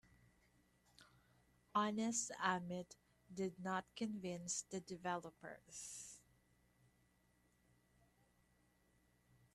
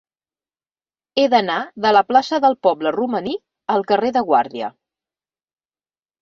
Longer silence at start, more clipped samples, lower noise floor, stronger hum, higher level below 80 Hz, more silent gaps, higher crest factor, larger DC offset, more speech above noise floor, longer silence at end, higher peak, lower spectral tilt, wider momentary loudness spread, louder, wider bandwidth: second, 1 s vs 1.15 s; neither; second, -77 dBFS vs under -90 dBFS; first, 60 Hz at -70 dBFS vs none; second, -80 dBFS vs -64 dBFS; neither; first, 26 dB vs 20 dB; neither; second, 32 dB vs over 73 dB; first, 3.35 s vs 1.5 s; second, -22 dBFS vs 0 dBFS; second, -3.5 dB/octave vs -5 dB/octave; first, 16 LU vs 11 LU; second, -44 LUFS vs -18 LUFS; first, 13.5 kHz vs 7.2 kHz